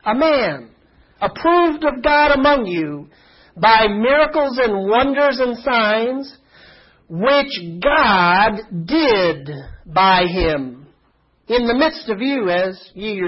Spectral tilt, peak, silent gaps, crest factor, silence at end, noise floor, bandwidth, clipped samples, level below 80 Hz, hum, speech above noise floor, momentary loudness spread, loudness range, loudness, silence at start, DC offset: -9 dB/octave; 0 dBFS; none; 16 dB; 0 s; -59 dBFS; 5.8 kHz; under 0.1%; -40 dBFS; none; 43 dB; 14 LU; 3 LU; -16 LUFS; 0.05 s; under 0.1%